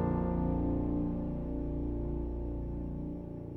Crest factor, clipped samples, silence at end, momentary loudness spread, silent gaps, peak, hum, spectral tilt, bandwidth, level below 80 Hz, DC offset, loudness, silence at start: 14 dB; under 0.1%; 0 s; 7 LU; none; -20 dBFS; none; -12 dB/octave; 3.3 kHz; -40 dBFS; under 0.1%; -36 LUFS; 0 s